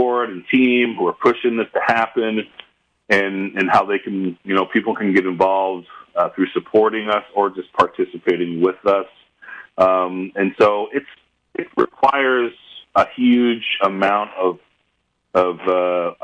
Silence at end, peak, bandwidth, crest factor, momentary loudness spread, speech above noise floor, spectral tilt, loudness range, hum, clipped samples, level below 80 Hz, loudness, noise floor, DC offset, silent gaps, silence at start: 0 s; -2 dBFS; 9.2 kHz; 16 dB; 9 LU; 51 dB; -6.5 dB/octave; 1 LU; none; under 0.1%; -62 dBFS; -18 LUFS; -69 dBFS; under 0.1%; none; 0 s